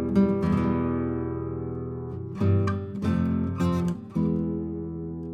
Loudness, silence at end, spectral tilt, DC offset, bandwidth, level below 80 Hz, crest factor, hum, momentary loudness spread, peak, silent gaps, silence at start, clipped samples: -27 LUFS; 0 s; -9.5 dB/octave; under 0.1%; 9.6 kHz; -44 dBFS; 16 dB; none; 10 LU; -10 dBFS; none; 0 s; under 0.1%